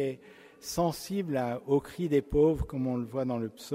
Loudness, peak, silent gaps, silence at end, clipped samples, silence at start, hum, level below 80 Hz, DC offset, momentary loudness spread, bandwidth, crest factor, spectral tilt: -30 LUFS; -14 dBFS; none; 0 s; under 0.1%; 0 s; none; -48 dBFS; under 0.1%; 9 LU; 16 kHz; 16 dB; -6.5 dB/octave